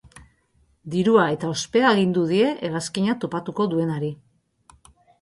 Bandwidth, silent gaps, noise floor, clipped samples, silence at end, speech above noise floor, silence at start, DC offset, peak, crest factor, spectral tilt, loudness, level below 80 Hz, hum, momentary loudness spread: 11.5 kHz; none; -63 dBFS; under 0.1%; 1.05 s; 42 dB; 0.15 s; under 0.1%; -4 dBFS; 18 dB; -5.5 dB/octave; -22 LUFS; -60 dBFS; none; 10 LU